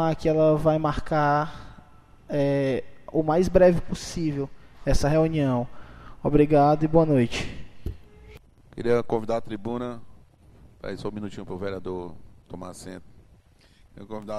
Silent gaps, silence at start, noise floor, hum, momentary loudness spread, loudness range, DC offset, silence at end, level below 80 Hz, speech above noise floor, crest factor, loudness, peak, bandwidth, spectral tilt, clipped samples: none; 0 s; -56 dBFS; none; 20 LU; 14 LU; under 0.1%; 0 s; -40 dBFS; 33 dB; 20 dB; -24 LUFS; -4 dBFS; 13 kHz; -7 dB/octave; under 0.1%